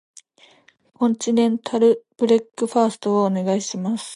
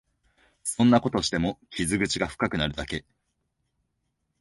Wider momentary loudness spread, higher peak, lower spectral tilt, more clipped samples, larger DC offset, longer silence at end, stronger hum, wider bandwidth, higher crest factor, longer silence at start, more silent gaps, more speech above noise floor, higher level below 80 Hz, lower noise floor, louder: second, 5 LU vs 13 LU; first, -4 dBFS vs -8 dBFS; about the same, -5.5 dB/octave vs -4.5 dB/octave; neither; neither; second, 0 s vs 1.4 s; neither; about the same, 11.5 kHz vs 11.5 kHz; about the same, 16 dB vs 20 dB; first, 1 s vs 0.65 s; neither; second, 35 dB vs 52 dB; second, -72 dBFS vs -48 dBFS; second, -54 dBFS vs -77 dBFS; first, -20 LUFS vs -26 LUFS